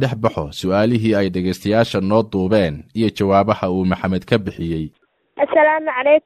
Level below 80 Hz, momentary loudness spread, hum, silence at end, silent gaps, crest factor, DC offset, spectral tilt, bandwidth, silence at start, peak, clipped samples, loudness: -46 dBFS; 8 LU; none; 0.05 s; none; 16 dB; under 0.1%; -7 dB/octave; 14 kHz; 0 s; -2 dBFS; under 0.1%; -18 LUFS